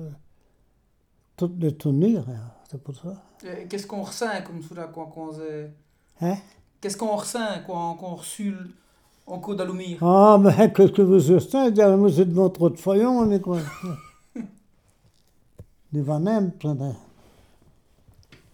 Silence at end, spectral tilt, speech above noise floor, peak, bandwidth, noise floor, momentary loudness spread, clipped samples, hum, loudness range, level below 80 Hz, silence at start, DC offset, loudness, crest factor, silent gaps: 1.55 s; -7.5 dB/octave; 43 dB; -2 dBFS; 18 kHz; -65 dBFS; 23 LU; under 0.1%; none; 15 LU; -62 dBFS; 0 s; under 0.1%; -21 LUFS; 20 dB; none